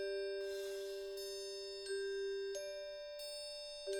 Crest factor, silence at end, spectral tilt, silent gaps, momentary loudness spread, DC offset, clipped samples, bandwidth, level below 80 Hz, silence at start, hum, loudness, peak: 14 dB; 0 s; -1 dB/octave; none; 5 LU; under 0.1%; under 0.1%; 20 kHz; -72 dBFS; 0 s; none; -44 LUFS; -30 dBFS